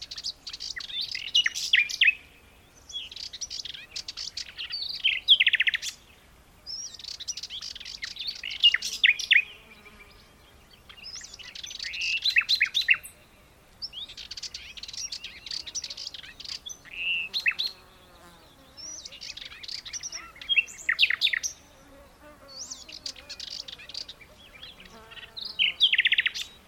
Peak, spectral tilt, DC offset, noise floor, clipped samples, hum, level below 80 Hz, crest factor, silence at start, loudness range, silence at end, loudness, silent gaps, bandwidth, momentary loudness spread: -8 dBFS; 2 dB/octave; under 0.1%; -56 dBFS; under 0.1%; none; -60 dBFS; 22 dB; 0 s; 11 LU; 0.1 s; -26 LUFS; none; 18.5 kHz; 19 LU